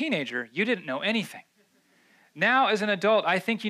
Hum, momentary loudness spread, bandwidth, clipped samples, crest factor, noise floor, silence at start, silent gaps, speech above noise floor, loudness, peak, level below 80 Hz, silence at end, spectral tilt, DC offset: none; 8 LU; 15 kHz; under 0.1%; 16 dB; -65 dBFS; 0 s; none; 39 dB; -25 LUFS; -12 dBFS; -86 dBFS; 0 s; -4.5 dB/octave; under 0.1%